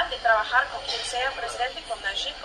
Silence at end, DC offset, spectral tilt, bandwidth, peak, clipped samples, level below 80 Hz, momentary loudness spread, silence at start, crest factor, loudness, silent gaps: 0 s; under 0.1%; -0.5 dB/octave; 12.5 kHz; -8 dBFS; under 0.1%; -50 dBFS; 8 LU; 0 s; 18 dB; -25 LUFS; none